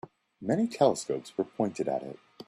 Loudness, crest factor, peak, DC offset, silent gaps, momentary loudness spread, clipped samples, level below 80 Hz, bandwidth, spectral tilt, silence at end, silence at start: -30 LUFS; 20 dB; -10 dBFS; under 0.1%; none; 10 LU; under 0.1%; -72 dBFS; 13 kHz; -6 dB/octave; 0.05 s; 0.4 s